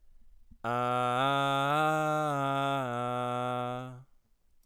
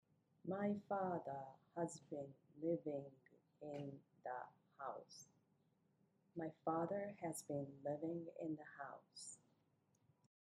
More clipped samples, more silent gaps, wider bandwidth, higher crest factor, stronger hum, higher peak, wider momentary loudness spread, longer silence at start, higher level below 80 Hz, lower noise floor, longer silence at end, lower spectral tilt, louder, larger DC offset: neither; neither; first, 17 kHz vs 11 kHz; second, 14 dB vs 20 dB; neither; first, -18 dBFS vs -30 dBFS; second, 9 LU vs 13 LU; second, 0.05 s vs 0.45 s; first, -64 dBFS vs under -90 dBFS; second, -64 dBFS vs -81 dBFS; second, 0.65 s vs 1.2 s; about the same, -5.5 dB/octave vs -6 dB/octave; first, -30 LUFS vs -48 LUFS; neither